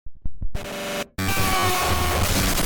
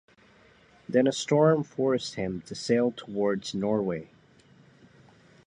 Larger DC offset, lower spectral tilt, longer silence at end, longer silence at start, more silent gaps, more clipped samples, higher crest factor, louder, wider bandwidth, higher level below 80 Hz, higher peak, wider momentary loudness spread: neither; second, -3.5 dB/octave vs -5.5 dB/octave; second, 0 s vs 1.4 s; second, 0.05 s vs 0.9 s; neither; neither; second, 10 dB vs 20 dB; first, -22 LUFS vs -27 LUFS; first, 19.5 kHz vs 10.5 kHz; first, -30 dBFS vs -64 dBFS; about the same, -12 dBFS vs -10 dBFS; first, 14 LU vs 11 LU